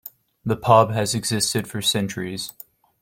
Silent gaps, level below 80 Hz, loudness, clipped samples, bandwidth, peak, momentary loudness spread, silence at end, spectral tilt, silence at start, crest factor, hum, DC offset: none; -56 dBFS; -21 LUFS; under 0.1%; 16.5 kHz; -2 dBFS; 16 LU; 0.5 s; -4 dB/octave; 0.05 s; 20 dB; none; under 0.1%